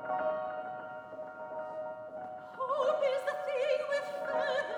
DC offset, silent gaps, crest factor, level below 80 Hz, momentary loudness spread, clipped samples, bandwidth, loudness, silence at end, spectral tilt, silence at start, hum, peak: under 0.1%; none; 16 dB; -82 dBFS; 13 LU; under 0.1%; 11 kHz; -35 LUFS; 0 s; -3.5 dB/octave; 0 s; none; -18 dBFS